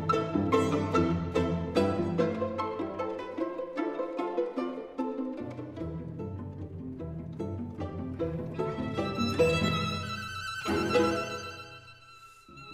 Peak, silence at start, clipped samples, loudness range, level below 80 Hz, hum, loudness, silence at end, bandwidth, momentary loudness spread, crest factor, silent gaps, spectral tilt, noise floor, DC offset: -12 dBFS; 0 s; under 0.1%; 8 LU; -58 dBFS; none; -32 LUFS; 0 s; 15.5 kHz; 14 LU; 20 dB; none; -6 dB/octave; -53 dBFS; under 0.1%